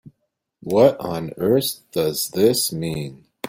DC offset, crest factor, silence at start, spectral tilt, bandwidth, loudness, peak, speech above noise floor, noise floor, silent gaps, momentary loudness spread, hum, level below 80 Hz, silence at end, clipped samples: under 0.1%; 20 dB; 0.05 s; -4.5 dB/octave; 16.5 kHz; -20 LUFS; -2 dBFS; 55 dB; -75 dBFS; none; 12 LU; none; -56 dBFS; 0 s; under 0.1%